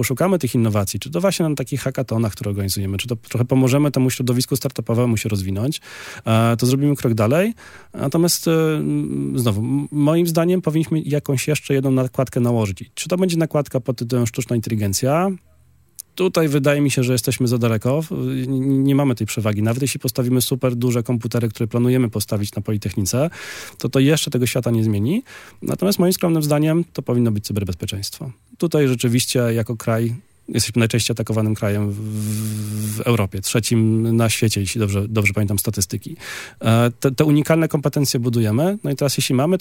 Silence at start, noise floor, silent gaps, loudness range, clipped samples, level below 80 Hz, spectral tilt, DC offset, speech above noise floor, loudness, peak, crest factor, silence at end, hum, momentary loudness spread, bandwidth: 0 s; -55 dBFS; none; 2 LU; under 0.1%; -54 dBFS; -5.5 dB/octave; under 0.1%; 36 dB; -19 LUFS; 0 dBFS; 18 dB; 0 s; none; 8 LU; 17 kHz